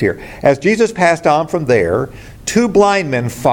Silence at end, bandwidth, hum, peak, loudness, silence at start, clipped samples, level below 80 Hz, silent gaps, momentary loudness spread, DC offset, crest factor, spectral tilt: 0 s; 17 kHz; none; 0 dBFS; -14 LUFS; 0 s; under 0.1%; -42 dBFS; none; 7 LU; under 0.1%; 14 dB; -5.5 dB/octave